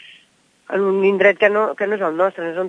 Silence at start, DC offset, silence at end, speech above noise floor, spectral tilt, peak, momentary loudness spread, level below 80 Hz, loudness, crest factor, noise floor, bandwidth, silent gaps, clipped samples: 0.7 s; under 0.1%; 0 s; 39 dB; -6.5 dB/octave; -2 dBFS; 7 LU; -74 dBFS; -17 LUFS; 18 dB; -56 dBFS; 7.8 kHz; none; under 0.1%